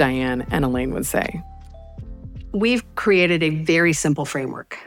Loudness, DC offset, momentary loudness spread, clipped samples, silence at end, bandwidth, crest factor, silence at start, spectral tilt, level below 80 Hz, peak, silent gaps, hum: -20 LUFS; under 0.1%; 20 LU; under 0.1%; 0 s; 18 kHz; 18 dB; 0 s; -5 dB/octave; -40 dBFS; -2 dBFS; none; none